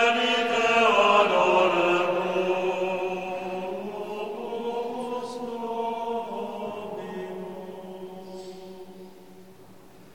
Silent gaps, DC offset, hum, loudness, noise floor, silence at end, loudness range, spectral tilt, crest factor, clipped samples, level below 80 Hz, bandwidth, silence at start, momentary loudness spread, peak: none; 0.2%; none; -25 LUFS; -51 dBFS; 0.05 s; 16 LU; -4 dB/octave; 20 dB; under 0.1%; -66 dBFS; 16.5 kHz; 0 s; 21 LU; -6 dBFS